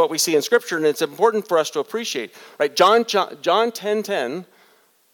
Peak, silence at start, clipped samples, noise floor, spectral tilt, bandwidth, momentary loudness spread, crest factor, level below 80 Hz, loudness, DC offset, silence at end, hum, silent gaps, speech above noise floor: -2 dBFS; 0 s; under 0.1%; -57 dBFS; -2.5 dB/octave; 19 kHz; 11 LU; 18 dB; -76 dBFS; -20 LUFS; under 0.1%; 0.7 s; none; none; 37 dB